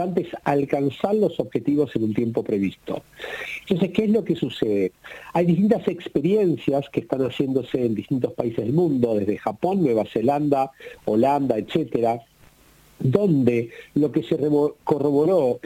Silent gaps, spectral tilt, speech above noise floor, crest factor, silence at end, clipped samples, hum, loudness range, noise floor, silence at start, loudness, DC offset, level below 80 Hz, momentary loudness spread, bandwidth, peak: none; -8.5 dB/octave; 32 dB; 18 dB; 0.05 s; under 0.1%; none; 2 LU; -54 dBFS; 0 s; -22 LUFS; under 0.1%; -58 dBFS; 8 LU; 16 kHz; -4 dBFS